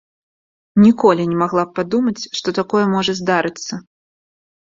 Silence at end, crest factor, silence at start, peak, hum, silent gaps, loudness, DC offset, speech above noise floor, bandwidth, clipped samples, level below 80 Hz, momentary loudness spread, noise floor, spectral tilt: 0.9 s; 16 dB; 0.75 s; -2 dBFS; none; none; -17 LUFS; under 0.1%; over 74 dB; 7.6 kHz; under 0.1%; -56 dBFS; 11 LU; under -90 dBFS; -5.5 dB/octave